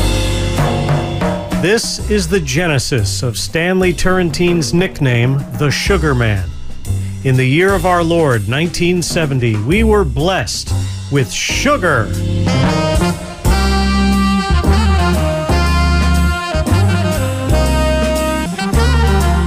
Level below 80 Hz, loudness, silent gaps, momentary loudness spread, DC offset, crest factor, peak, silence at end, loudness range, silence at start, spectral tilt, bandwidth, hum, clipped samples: -20 dBFS; -14 LUFS; none; 5 LU; under 0.1%; 12 dB; 0 dBFS; 0 s; 2 LU; 0 s; -5.5 dB/octave; 16 kHz; none; under 0.1%